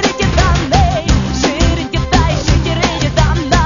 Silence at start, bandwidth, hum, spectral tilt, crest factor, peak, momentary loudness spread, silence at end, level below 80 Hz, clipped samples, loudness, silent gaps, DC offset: 0 s; 7.4 kHz; none; -5 dB/octave; 12 dB; 0 dBFS; 3 LU; 0 s; -18 dBFS; under 0.1%; -13 LUFS; none; under 0.1%